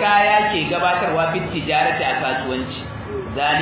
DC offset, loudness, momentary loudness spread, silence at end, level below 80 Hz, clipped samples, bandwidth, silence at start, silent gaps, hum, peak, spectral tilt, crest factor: under 0.1%; -19 LUFS; 13 LU; 0 s; -44 dBFS; under 0.1%; 4 kHz; 0 s; none; none; -2 dBFS; -8.5 dB/octave; 16 dB